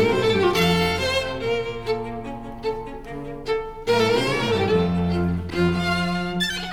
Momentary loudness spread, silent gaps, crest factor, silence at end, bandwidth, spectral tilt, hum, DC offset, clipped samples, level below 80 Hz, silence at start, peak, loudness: 13 LU; none; 16 dB; 0 s; 17 kHz; -5.5 dB/octave; none; under 0.1%; under 0.1%; -40 dBFS; 0 s; -6 dBFS; -22 LUFS